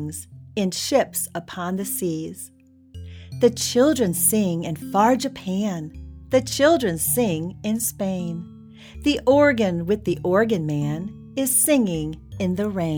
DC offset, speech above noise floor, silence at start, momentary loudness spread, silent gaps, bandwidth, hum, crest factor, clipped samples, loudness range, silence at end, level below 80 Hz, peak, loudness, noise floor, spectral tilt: under 0.1%; 20 dB; 0 s; 14 LU; none; over 20 kHz; none; 18 dB; under 0.1%; 3 LU; 0 s; -48 dBFS; -4 dBFS; -22 LUFS; -42 dBFS; -4.5 dB/octave